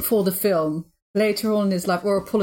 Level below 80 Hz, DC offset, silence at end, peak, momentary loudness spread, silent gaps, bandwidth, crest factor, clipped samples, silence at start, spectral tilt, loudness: -58 dBFS; under 0.1%; 0 s; -10 dBFS; 7 LU; 1.02-1.14 s; 17 kHz; 12 dB; under 0.1%; 0 s; -5.5 dB/octave; -22 LUFS